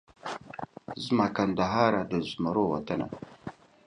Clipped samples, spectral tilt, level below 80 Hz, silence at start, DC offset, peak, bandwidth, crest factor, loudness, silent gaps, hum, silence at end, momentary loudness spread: under 0.1%; -6.5 dB/octave; -58 dBFS; 0.25 s; under 0.1%; -8 dBFS; 10.5 kHz; 22 dB; -29 LUFS; none; none; 0.35 s; 17 LU